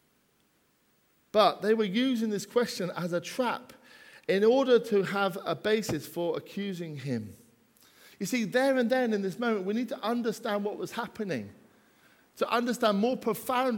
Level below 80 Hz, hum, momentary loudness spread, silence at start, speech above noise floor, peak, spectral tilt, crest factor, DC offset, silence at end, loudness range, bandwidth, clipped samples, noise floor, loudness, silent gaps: -72 dBFS; none; 11 LU; 1.35 s; 41 dB; -8 dBFS; -5 dB/octave; 22 dB; under 0.1%; 0 s; 5 LU; 18 kHz; under 0.1%; -69 dBFS; -29 LUFS; none